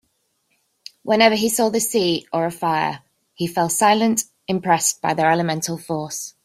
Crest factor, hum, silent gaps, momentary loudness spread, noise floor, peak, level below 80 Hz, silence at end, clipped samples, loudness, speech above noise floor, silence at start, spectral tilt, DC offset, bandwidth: 18 dB; none; none; 11 LU; -68 dBFS; -2 dBFS; -62 dBFS; 0.15 s; under 0.1%; -19 LUFS; 49 dB; 1.05 s; -3.5 dB/octave; under 0.1%; 16 kHz